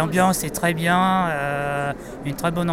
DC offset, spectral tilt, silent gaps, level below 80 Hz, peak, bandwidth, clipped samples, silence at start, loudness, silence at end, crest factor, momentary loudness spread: under 0.1%; -5 dB/octave; none; -46 dBFS; -4 dBFS; 16 kHz; under 0.1%; 0 s; -22 LUFS; 0 s; 16 dB; 9 LU